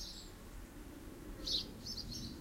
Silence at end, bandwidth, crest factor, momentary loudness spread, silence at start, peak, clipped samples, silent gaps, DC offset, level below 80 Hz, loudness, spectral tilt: 0 s; 16 kHz; 20 dB; 15 LU; 0 s; -24 dBFS; under 0.1%; none; under 0.1%; -54 dBFS; -43 LUFS; -3 dB/octave